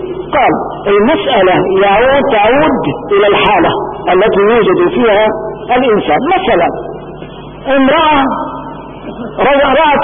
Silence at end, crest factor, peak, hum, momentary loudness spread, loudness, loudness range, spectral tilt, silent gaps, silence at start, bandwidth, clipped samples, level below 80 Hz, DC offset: 0 s; 10 dB; 0 dBFS; none; 16 LU; -10 LUFS; 3 LU; -9.5 dB/octave; none; 0 s; 3.7 kHz; under 0.1%; -36 dBFS; under 0.1%